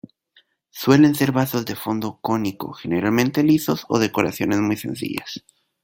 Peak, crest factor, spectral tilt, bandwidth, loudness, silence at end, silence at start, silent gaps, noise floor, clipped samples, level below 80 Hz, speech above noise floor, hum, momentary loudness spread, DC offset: -2 dBFS; 20 dB; -6 dB/octave; 17 kHz; -20 LUFS; 0.45 s; 0.75 s; none; -60 dBFS; under 0.1%; -58 dBFS; 40 dB; none; 13 LU; under 0.1%